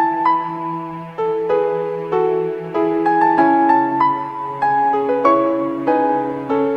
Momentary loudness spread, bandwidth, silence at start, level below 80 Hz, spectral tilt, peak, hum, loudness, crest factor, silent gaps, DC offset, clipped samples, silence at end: 10 LU; 6 kHz; 0 s; -60 dBFS; -8 dB/octave; -2 dBFS; none; -17 LUFS; 16 dB; none; under 0.1%; under 0.1%; 0 s